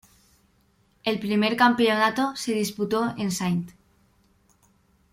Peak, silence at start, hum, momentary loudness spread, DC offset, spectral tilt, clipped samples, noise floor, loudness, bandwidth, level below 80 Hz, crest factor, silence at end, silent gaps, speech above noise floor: -4 dBFS; 1.05 s; none; 9 LU; under 0.1%; -4.5 dB/octave; under 0.1%; -64 dBFS; -24 LUFS; 16 kHz; -64 dBFS; 22 dB; 1.45 s; none; 41 dB